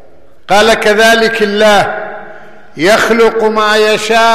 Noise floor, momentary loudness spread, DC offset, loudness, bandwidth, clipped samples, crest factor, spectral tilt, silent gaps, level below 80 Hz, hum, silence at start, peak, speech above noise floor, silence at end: -34 dBFS; 8 LU; 3%; -9 LUFS; 15 kHz; under 0.1%; 8 dB; -3 dB/octave; none; -42 dBFS; none; 0.5 s; 0 dBFS; 26 dB; 0 s